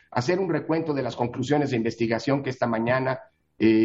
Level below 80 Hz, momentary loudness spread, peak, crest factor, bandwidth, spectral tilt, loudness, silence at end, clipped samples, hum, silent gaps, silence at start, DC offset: -62 dBFS; 5 LU; -8 dBFS; 18 dB; 7.8 kHz; -7 dB/octave; -25 LUFS; 0 s; under 0.1%; none; none; 0.1 s; under 0.1%